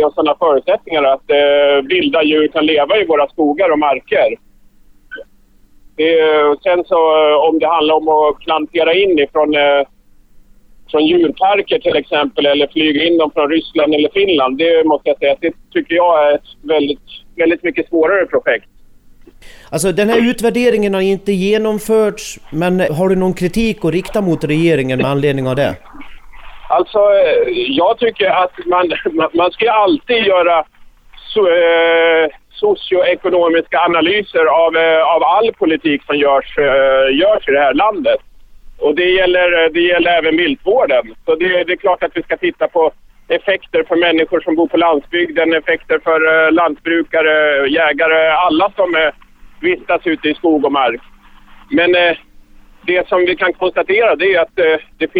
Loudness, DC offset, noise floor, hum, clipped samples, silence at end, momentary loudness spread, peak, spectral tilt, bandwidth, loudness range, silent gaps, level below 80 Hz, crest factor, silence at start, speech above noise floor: -13 LUFS; under 0.1%; -47 dBFS; none; under 0.1%; 0 s; 6 LU; 0 dBFS; -5 dB/octave; 14 kHz; 3 LU; none; -44 dBFS; 12 dB; 0 s; 34 dB